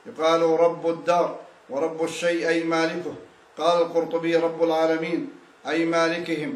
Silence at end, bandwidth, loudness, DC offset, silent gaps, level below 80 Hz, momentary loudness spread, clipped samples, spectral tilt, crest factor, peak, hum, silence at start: 0 s; 12 kHz; -23 LUFS; under 0.1%; none; -78 dBFS; 12 LU; under 0.1%; -5 dB/octave; 14 dB; -8 dBFS; none; 0.05 s